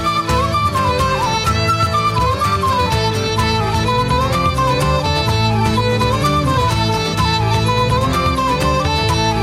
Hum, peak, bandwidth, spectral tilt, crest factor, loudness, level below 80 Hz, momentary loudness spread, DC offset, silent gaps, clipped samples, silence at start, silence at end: none; -2 dBFS; 15.5 kHz; -5 dB/octave; 12 dB; -16 LUFS; -28 dBFS; 1 LU; under 0.1%; none; under 0.1%; 0 s; 0 s